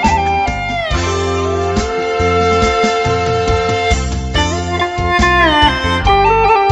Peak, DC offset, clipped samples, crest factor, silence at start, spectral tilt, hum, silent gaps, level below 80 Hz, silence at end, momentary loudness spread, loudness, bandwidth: 0 dBFS; under 0.1%; under 0.1%; 14 dB; 0 s; -4.5 dB/octave; none; none; -24 dBFS; 0 s; 7 LU; -13 LUFS; 10.5 kHz